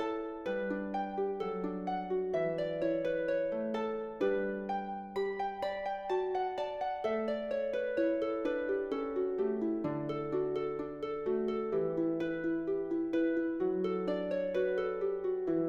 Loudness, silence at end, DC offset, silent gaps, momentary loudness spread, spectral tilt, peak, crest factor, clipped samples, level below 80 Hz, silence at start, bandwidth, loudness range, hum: -35 LUFS; 0 s; under 0.1%; none; 4 LU; -8 dB/octave; -20 dBFS; 14 dB; under 0.1%; -64 dBFS; 0 s; 7.4 kHz; 2 LU; none